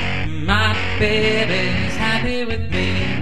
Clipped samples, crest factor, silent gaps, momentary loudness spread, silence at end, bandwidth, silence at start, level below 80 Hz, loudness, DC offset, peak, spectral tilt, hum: under 0.1%; 18 dB; none; 6 LU; 0 s; 12.5 kHz; 0 s; -32 dBFS; -19 LUFS; 6%; -2 dBFS; -5.5 dB/octave; none